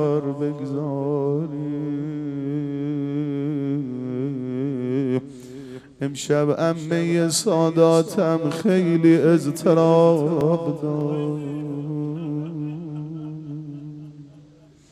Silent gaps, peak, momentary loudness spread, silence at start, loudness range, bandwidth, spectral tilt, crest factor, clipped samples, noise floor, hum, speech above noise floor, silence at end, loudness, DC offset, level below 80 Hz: none; -4 dBFS; 17 LU; 0 s; 10 LU; 14 kHz; -6.5 dB/octave; 18 dB; under 0.1%; -50 dBFS; none; 31 dB; 0.5 s; -22 LUFS; under 0.1%; -64 dBFS